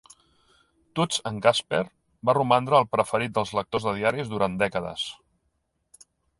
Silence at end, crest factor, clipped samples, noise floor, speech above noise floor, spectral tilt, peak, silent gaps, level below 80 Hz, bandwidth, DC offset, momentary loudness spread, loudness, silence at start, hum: 1.25 s; 22 dB; under 0.1%; -74 dBFS; 50 dB; -4.5 dB/octave; -6 dBFS; none; -58 dBFS; 11.5 kHz; under 0.1%; 10 LU; -25 LUFS; 0.95 s; none